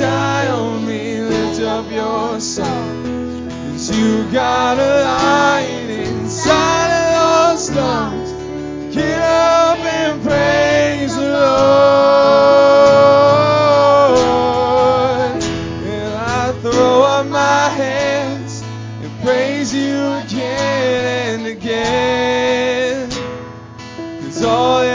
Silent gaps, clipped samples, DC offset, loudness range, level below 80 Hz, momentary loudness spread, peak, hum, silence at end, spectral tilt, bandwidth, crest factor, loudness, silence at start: none; under 0.1%; under 0.1%; 8 LU; -40 dBFS; 13 LU; 0 dBFS; none; 0 s; -4.5 dB/octave; 7.6 kHz; 14 dB; -14 LUFS; 0 s